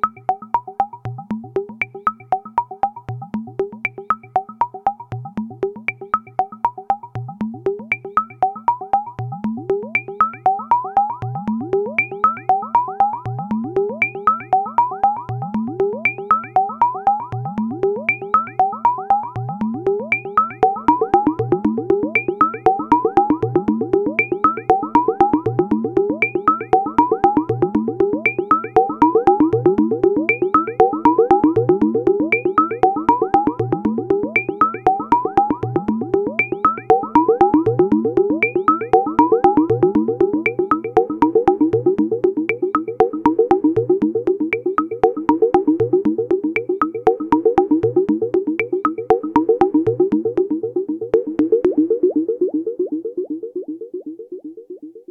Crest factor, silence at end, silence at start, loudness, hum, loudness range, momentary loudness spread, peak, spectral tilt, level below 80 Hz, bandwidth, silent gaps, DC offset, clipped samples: 18 dB; 0.1 s; 0.05 s; -18 LUFS; none; 7 LU; 9 LU; 0 dBFS; -9 dB/octave; -50 dBFS; 6.6 kHz; none; under 0.1%; under 0.1%